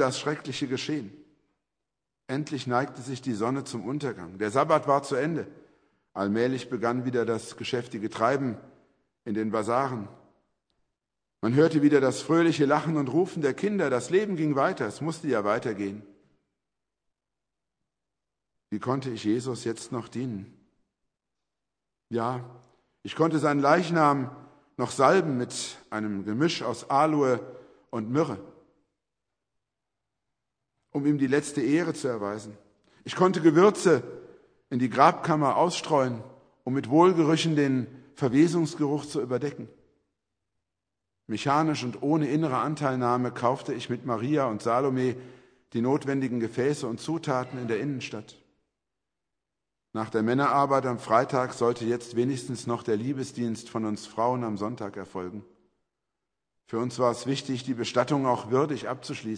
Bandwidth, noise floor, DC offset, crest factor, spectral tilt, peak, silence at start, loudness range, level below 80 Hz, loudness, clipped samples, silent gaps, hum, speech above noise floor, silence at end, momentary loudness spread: 10.5 kHz; -87 dBFS; under 0.1%; 24 dB; -6 dB/octave; -4 dBFS; 0 s; 9 LU; -72 dBFS; -27 LUFS; under 0.1%; none; none; 61 dB; 0 s; 13 LU